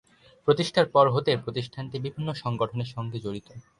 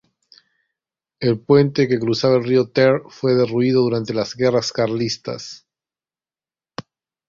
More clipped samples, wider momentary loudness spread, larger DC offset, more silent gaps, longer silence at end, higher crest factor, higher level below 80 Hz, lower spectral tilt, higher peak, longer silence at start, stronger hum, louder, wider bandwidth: neither; about the same, 14 LU vs 16 LU; neither; neither; second, 0.2 s vs 0.45 s; about the same, 20 dB vs 18 dB; about the same, -60 dBFS vs -58 dBFS; about the same, -6 dB/octave vs -6 dB/octave; second, -6 dBFS vs -2 dBFS; second, 0.45 s vs 1.2 s; neither; second, -26 LUFS vs -18 LUFS; first, 11.5 kHz vs 7.6 kHz